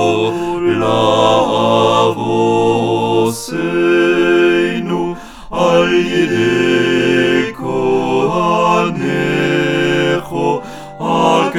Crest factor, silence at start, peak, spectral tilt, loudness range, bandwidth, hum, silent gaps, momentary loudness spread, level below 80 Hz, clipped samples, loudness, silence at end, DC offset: 14 dB; 0 s; 0 dBFS; -5.5 dB/octave; 2 LU; 13.5 kHz; none; none; 7 LU; -44 dBFS; under 0.1%; -14 LUFS; 0 s; under 0.1%